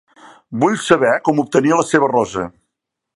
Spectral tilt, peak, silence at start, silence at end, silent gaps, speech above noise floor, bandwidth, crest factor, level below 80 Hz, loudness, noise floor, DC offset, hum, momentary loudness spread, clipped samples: -5 dB/octave; 0 dBFS; 0.5 s; 0.65 s; none; 63 dB; 11.5 kHz; 16 dB; -54 dBFS; -16 LUFS; -78 dBFS; under 0.1%; none; 11 LU; under 0.1%